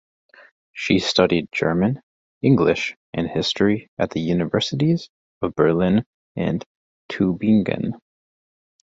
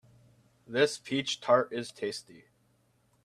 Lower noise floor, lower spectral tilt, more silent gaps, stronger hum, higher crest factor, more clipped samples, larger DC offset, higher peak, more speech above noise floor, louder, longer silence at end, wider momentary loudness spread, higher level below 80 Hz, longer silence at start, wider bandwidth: first, under -90 dBFS vs -70 dBFS; first, -6.5 dB/octave vs -3.5 dB/octave; first, 2.03-2.41 s, 2.96-3.13 s, 3.88-3.97 s, 5.09-5.41 s, 6.06-6.35 s, 6.66-7.09 s vs none; neither; about the same, 20 dB vs 22 dB; neither; neither; first, -2 dBFS vs -10 dBFS; first, over 70 dB vs 39 dB; first, -21 LUFS vs -30 LUFS; second, 0.9 s vs 1.05 s; about the same, 12 LU vs 11 LU; first, -50 dBFS vs -76 dBFS; about the same, 0.75 s vs 0.7 s; second, 7.8 kHz vs 13.5 kHz